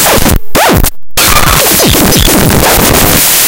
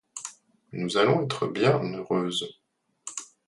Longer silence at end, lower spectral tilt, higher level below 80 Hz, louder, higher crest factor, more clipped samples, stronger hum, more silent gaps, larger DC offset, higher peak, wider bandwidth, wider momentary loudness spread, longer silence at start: second, 0 s vs 0.25 s; second, -3 dB/octave vs -5 dB/octave; first, -16 dBFS vs -68 dBFS; first, -5 LUFS vs -26 LUFS; second, 6 dB vs 20 dB; first, 4% vs under 0.1%; neither; neither; neither; first, 0 dBFS vs -8 dBFS; first, over 20 kHz vs 11.5 kHz; second, 4 LU vs 17 LU; second, 0 s vs 0.15 s